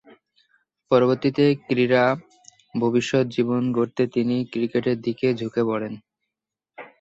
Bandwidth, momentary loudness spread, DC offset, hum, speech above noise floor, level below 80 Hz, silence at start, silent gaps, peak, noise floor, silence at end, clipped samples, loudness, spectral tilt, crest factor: 8 kHz; 7 LU; under 0.1%; none; 64 dB; -64 dBFS; 0.9 s; none; -6 dBFS; -86 dBFS; 0.15 s; under 0.1%; -22 LUFS; -7 dB/octave; 18 dB